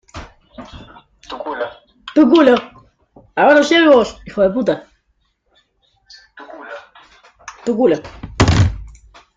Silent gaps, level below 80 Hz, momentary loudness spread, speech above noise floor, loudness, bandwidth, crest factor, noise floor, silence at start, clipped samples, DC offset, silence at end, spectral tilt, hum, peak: none; -36 dBFS; 26 LU; 52 dB; -14 LUFS; 9.2 kHz; 18 dB; -64 dBFS; 0.15 s; under 0.1%; under 0.1%; 0.45 s; -6 dB/octave; none; 0 dBFS